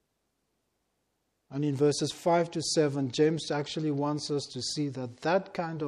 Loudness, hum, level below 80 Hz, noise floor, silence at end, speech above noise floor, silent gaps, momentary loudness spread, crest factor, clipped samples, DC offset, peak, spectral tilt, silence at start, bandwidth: -29 LUFS; none; -72 dBFS; -79 dBFS; 0 s; 50 dB; none; 6 LU; 18 dB; under 0.1%; under 0.1%; -14 dBFS; -5 dB/octave; 1.5 s; 13 kHz